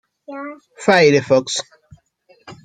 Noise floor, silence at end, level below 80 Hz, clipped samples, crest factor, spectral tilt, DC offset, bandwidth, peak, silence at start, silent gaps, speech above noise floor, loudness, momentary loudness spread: -56 dBFS; 0.1 s; -60 dBFS; under 0.1%; 18 dB; -4 dB/octave; under 0.1%; 9.6 kHz; -2 dBFS; 0.3 s; none; 39 dB; -15 LUFS; 22 LU